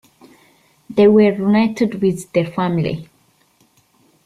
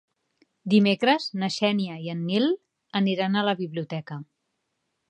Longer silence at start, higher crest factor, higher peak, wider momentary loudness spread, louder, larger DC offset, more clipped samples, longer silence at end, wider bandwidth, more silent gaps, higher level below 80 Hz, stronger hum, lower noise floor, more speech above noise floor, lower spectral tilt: first, 0.9 s vs 0.65 s; about the same, 16 dB vs 18 dB; first, -2 dBFS vs -8 dBFS; about the same, 11 LU vs 13 LU; first, -16 LUFS vs -25 LUFS; neither; neither; first, 1.2 s vs 0.85 s; first, 12.5 kHz vs 9.4 kHz; neither; first, -54 dBFS vs -76 dBFS; neither; second, -58 dBFS vs -78 dBFS; second, 42 dB vs 54 dB; first, -7.5 dB/octave vs -6 dB/octave